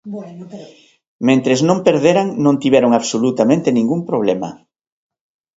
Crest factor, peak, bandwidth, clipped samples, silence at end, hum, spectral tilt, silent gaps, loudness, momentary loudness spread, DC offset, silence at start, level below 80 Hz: 16 dB; 0 dBFS; 8 kHz; under 0.1%; 1.05 s; none; -6 dB/octave; 1.07-1.19 s; -15 LUFS; 17 LU; under 0.1%; 0.05 s; -60 dBFS